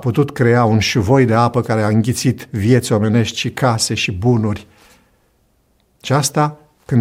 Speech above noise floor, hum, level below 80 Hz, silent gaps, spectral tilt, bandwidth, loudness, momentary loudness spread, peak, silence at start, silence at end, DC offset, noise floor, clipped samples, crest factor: 44 dB; none; -46 dBFS; none; -5.5 dB/octave; 16 kHz; -16 LUFS; 6 LU; 0 dBFS; 0 s; 0 s; under 0.1%; -59 dBFS; under 0.1%; 14 dB